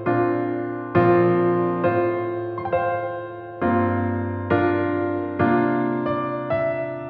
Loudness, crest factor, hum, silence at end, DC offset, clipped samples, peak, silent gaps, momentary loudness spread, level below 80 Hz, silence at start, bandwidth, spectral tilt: -22 LUFS; 16 dB; none; 0 s; under 0.1%; under 0.1%; -4 dBFS; none; 9 LU; -56 dBFS; 0 s; 4.6 kHz; -11 dB/octave